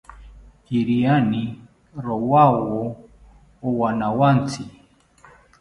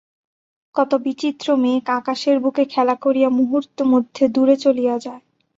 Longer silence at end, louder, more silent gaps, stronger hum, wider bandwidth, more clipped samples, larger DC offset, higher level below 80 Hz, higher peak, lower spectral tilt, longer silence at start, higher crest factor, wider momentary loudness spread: first, 0.9 s vs 0.4 s; about the same, -20 LUFS vs -18 LUFS; neither; neither; first, 11.5 kHz vs 7.8 kHz; neither; neither; first, -50 dBFS vs -66 dBFS; about the same, -2 dBFS vs -4 dBFS; first, -8 dB/octave vs -5 dB/octave; second, 0.1 s vs 0.75 s; about the same, 20 dB vs 16 dB; first, 18 LU vs 7 LU